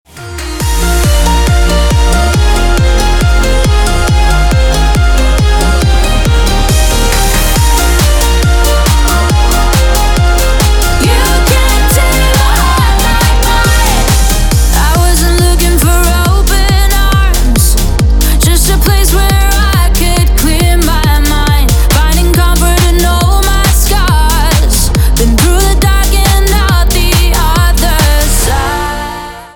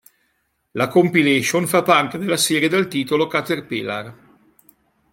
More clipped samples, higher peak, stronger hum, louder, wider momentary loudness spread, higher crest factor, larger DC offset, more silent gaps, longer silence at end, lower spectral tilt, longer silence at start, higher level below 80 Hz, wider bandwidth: neither; about the same, 0 dBFS vs -2 dBFS; neither; first, -9 LUFS vs -18 LUFS; second, 2 LU vs 11 LU; second, 8 dB vs 18 dB; neither; neither; second, 0.1 s vs 1 s; about the same, -4 dB/octave vs -4 dB/octave; second, 0.15 s vs 0.75 s; first, -8 dBFS vs -64 dBFS; first, 19 kHz vs 16.5 kHz